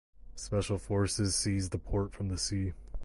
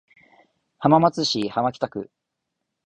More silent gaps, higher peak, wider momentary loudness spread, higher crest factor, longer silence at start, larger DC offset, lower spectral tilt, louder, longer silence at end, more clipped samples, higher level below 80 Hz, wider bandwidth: neither; second, -18 dBFS vs -4 dBFS; second, 8 LU vs 15 LU; second, 14 dB vs 20 dB; second, 0.2 s vs 0.8 s; neither; about the same, -4.5 dB/octave vs -5.5 dB/octave; second, -33 LUFS vs -21 LUFS; second, 0 s vs 0.85 s; neither; first, -44 dBFS vs -62 dBFS; first, 11.5 kHz vs 9.6 kHz